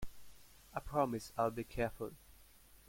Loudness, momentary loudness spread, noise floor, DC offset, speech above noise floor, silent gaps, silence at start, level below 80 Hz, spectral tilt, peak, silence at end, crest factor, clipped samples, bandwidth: -40 LUFS; 13 LU; -62 dBFS; under 0.1%; 24 dB; none; 0 s; -56 dBFS; -6 dB/octave; -20 dBFS; 0.15 s; 20 dB; under 0.1%; 16.5 kHz